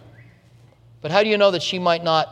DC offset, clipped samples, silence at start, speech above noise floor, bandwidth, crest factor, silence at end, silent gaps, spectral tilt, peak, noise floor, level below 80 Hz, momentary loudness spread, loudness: under 0.1%; under 0.1%; 1.05 s; 33 dB; 9.8 kHz; 20 dB; 0 s; none; -4.5 dB/octave; -2 dBFS; -51 dBFS; -64 dBFS; 5 LU; -19 LUFS